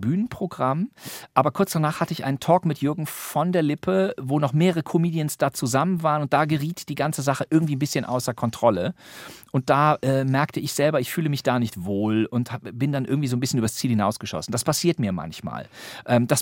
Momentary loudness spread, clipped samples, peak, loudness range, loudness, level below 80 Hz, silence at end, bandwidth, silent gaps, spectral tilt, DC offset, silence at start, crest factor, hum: 8 LU; under 0.1%; -2 dBFS; 2 LU; -23 LUFS; -62 dBFS; 0 s; 17 kHz; none; -5.5 dB/octave; under 0.1%; 0 s; 20 dB; none